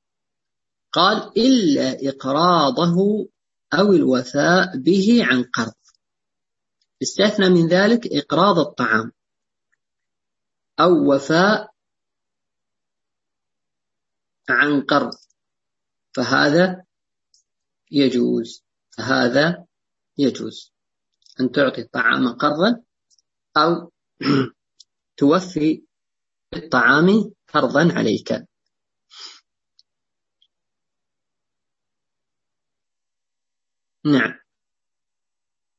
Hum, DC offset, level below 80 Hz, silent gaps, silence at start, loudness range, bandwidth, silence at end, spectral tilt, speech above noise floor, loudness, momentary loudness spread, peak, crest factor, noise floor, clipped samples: none; under 0.1%; -64 dBFS; none; 0.95 s; 7 LU; 8 kHz; 1.45 s; -5.5 dB/octave; 71 dB; -18 LUFS; 14 LU; 0 dBFS; 20 dB; -89 dBFS; under 0.1%